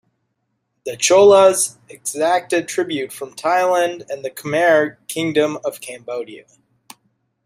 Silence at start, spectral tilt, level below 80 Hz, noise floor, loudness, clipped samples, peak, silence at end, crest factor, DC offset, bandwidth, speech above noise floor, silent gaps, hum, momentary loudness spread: 0.85 s; -3 dB/octave; -66 dBFS; -72 dBFS; -17 LUFS; under 0.1%; -2 dBFS; 1.05 s; 18 dB; under 0.1%; 15.5 kHz; 55 dB; none; none; 17 LU